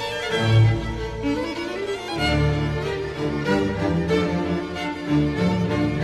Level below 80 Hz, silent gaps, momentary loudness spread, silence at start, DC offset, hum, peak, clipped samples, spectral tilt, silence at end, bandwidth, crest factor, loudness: -36 dBFS; none; 8 LU; 0 s; under 0.1%; none; -6 dBFS; under 0.1%; -6.5 dB/octave; 0 s; 12 kHz; 16 dB; -23 LUFS